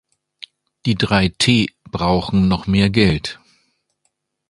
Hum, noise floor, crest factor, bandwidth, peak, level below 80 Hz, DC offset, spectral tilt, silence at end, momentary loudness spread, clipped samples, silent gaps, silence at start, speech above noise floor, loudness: none; -70 dBFS; 18 dB; 11.5 kHz; 0 dBFS; -38 dBFS; under 0.1%; -5.5 dB/octave; 1.15 s; 23 LU; under 0.1%; none; 0.85 s; 54 dB; -17 LUFS